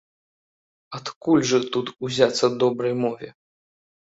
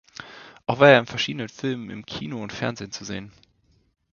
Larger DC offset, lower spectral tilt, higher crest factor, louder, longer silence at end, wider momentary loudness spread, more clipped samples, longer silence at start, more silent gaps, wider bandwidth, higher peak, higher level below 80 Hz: neither; about the same, -4.5 dB/octave vs -5 dB/octave; about the same, 22 dB vs 24 dB; about the same, -22 LUFS vs -23 LUFS; about the same, 0.85 s vs 0.85 s; second, 16 LU vs 20 LU; neither; first, 0.9 s vs 0.2 s; first, 1.16-1.21 s vs none; first, 8 kHz vs 7.2 kHz; about the same, -2 dBFS vs 0 dBFS; second, -66 dBFS vs -58 dBFS